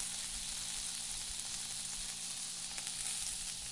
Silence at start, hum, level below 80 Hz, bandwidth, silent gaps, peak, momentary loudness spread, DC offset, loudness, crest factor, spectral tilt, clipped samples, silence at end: 0 s; none; -58 dBFS; 11.5 kHz; none; -18 dBFS; 2 LU; under 0.1%; -38 LUFS; 24 dB; 1 dB/octave; under 0.1%; 0 s